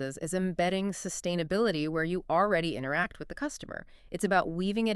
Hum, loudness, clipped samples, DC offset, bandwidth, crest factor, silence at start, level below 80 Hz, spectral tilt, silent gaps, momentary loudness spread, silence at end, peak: none; -30 LUFS; under 0.1%; under 0.1%; 13 kHz; 18 dB; 0 s; -54 dBFS; -5 dB/octave; none; 9 LU; 0 s; -12 dBFS